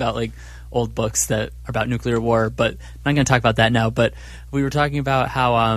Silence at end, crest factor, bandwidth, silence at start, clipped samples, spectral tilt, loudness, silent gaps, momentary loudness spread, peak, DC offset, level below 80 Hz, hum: 0 s; 18 dB; 14.5 kHz; 0 s; under 0.1%; -5 dB/octave; -20 LUFS; none; 10 LU; -2 dBFS; under 0.1%; -36 dBFS; none